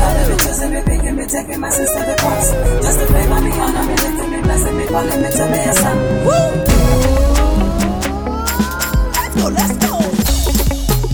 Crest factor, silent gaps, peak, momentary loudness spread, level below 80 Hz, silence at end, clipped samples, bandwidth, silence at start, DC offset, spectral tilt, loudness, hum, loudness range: 14 dB; none; 0 dBFS; 5 LU; -18 dBFS; 0 s; under 0.1%; over 20 kHz; 0 s; under 0.1%; -4.5 dB/octave; -15 LUFS; none; 2 LU